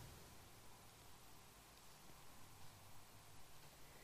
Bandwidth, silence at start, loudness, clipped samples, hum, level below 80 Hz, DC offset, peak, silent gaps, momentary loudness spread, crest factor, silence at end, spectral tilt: 15 kHz; 0 s; -63 LUFS; under 0.1%; none; -74 dBFS; under 0.1%; -46 dBFS; none; 1 LU; 14 dB; 0 s; -3 dB/octave